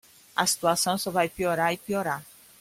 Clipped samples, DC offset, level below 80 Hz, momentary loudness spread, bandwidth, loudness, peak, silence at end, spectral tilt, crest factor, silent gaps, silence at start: under 0.1%; under 0.1%; -62 dBFS; 8 LU; 16.5 kHz; -26 LUFS; -6 dBFS; 0.35 s; -3 dB/octave; 20 dB; none; 0.35 s